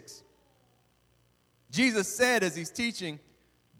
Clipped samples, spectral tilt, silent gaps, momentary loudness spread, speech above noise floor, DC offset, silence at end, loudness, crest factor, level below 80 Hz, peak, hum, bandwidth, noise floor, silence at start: under 0.1%; -3 dB/octave; none; 16 LU; 40 dB; under 0.1%; 0.6 s; -28 LUFS; 20 dB; -68 dBFS; -12 dBFS; 60 Hz at -60 dBFS; 18.5 kHz; -68 dBFS; 0.1 s